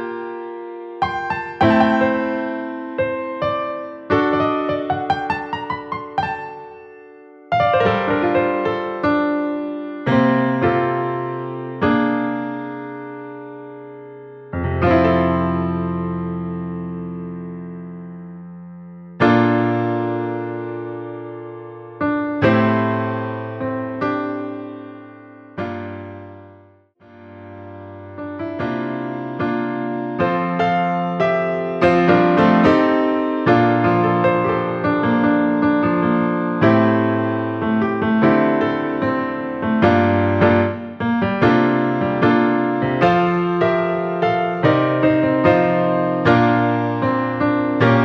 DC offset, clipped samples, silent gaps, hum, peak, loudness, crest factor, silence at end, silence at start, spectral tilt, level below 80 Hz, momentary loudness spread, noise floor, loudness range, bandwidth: under 0.1%; under 0.1%; none; none; -2 dBFS; -18 LUFS; 18 dB; 0 s; 0 s; -8.5 dB/octave; -48 dBFS; 18 LU; -50 dBFS; 10 LU; 6.8 kHz